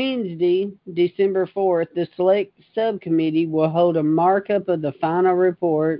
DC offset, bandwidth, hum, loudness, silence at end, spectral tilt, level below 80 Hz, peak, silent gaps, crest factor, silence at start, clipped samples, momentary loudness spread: under 0.1%; 5.4 kHz; none; -20 LUFS; 0 s; -12 dB/octave; -66 dBFS; -6 dBFS; none; 14 dB; 0 s; under 0.1%; 6 LU